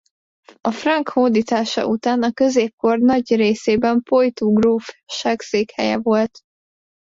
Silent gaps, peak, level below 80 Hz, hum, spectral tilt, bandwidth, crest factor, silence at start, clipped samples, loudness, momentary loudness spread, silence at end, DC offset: 2.73-2.78 s; -4 dBFS; -56 dBFS; none; -5 dB/octave; 7.8 kHz; 14 dB; 0.65 s; under 0.1%; -18 LUFS; 6 LU; 0.65 s; under 0.1%